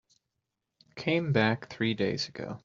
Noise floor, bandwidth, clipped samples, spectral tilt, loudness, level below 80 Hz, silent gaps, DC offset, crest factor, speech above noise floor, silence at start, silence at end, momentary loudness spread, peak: -85 dBFS; 7.6 kHz; under 0.1%; -4.5 dB/octave; -29 LUFS; -68 dBFS; none; under 0.1%; 22 dB; 55 dB; 0.95 s; 0.05 s; 9 LU; -10 dBFS